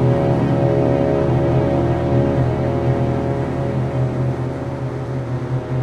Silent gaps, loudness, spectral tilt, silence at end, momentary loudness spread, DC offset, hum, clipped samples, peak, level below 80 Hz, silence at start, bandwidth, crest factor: none; -19 LUFS; -9.5 dB/octave; 0 s; 8 LU; under 0.1%; none; under 0.1%; -4 dBFS; -34 dBFS; 0 s; 7 kHz; 14 dB